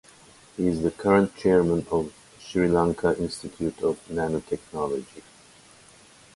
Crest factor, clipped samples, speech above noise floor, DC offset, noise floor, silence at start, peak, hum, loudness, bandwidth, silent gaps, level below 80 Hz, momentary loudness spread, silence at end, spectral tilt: 20 dB; under 0.1%; 28 dB; under 0.1%; -53 dBFS; 0.6 s; -6 dBFS; none; -25 LUFS; 11.5 kHz; none; -50 dBFS; 12 LU; 1.15 s; -7 dB/octave